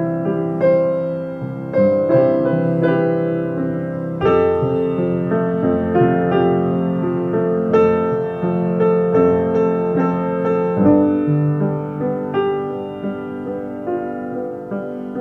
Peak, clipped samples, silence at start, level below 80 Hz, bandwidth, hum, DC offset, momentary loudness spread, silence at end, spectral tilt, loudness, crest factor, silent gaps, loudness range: -2 dBFS; under 0.1%; 0 s; -50 dBFS; 5.8 kHz; none; under 0.1%; 11 LU; 0 s; -10.5 dB/octave; -18 LUFS; 16 dB; none; 4 LU